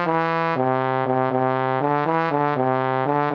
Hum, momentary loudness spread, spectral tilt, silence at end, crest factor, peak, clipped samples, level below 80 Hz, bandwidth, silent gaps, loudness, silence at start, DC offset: none; 1 LU; -9 dB/octave; 0 s; 14 dB; -6 dBFS; under 0.1%; -70 dBFS; 6.4 kHz; none; -21 LUFS; 0 s; under 0.1%